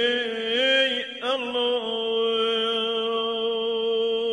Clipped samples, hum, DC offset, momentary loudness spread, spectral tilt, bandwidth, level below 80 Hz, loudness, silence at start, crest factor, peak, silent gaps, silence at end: under 0.1%; none; under 0.1%; 6 LU; -2.5 dB/octave; 10 kHz; -72 dBFS; -24 LUFS; 0 s; 14 dB; -10 dBFS; none; 0 s